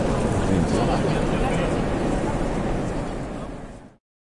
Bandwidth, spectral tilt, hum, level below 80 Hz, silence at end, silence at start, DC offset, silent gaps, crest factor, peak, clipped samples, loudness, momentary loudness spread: 11.5 kHz; -6.5 dB/octave; none; -32 dBFS; 0.35 s; 0 s; under 0.1%; none; 14 dB; -8 dBFS; under 0.1%; -24 LUFS; 12 LU